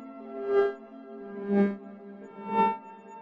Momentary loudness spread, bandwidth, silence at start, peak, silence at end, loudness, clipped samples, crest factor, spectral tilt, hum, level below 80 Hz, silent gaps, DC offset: 19 LU; 5.2 kHz; 0 s; -12 dBFS; 0 s; -28 LUFS; under 0.1%; 18 dB; -9 dB/octave; none; -72 dBFS; none; under 0.1%